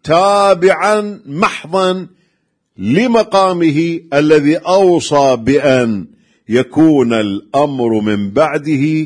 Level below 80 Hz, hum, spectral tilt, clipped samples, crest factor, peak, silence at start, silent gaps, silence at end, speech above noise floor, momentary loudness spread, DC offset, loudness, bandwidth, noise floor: -50 dBFS; none; -6 dB/octave; under 0.1%; 12 dB; 0 dBFS; 0.05 s; none; 0 s; 52 dB; 6 LU; under 0.1%; -12 LUFS; 10.5 kHz; -64 dBFS